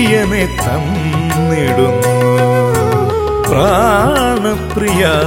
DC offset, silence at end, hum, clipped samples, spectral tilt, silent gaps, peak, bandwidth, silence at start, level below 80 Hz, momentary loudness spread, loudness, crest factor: under 0.1%; 0 s; none; under 0.1%; -5.5 dB/octave; none; 0 dBFS; 16.5 kHz; 0 s; -28 dBFS; 5 LU; -13 LUFS; 12 dB